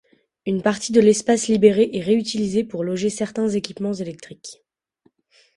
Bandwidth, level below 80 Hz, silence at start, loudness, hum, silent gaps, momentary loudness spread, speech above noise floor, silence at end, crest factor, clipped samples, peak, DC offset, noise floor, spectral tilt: 11.5 kHz; -60 dBFS; 0.45 s; -20 LUFS; none; none; 17 LU; 44 dB; 1.05 s; 20 dB; under 0.1%; -2 dBFS; under 0.1%; -63 dBFS; -5 dB/octave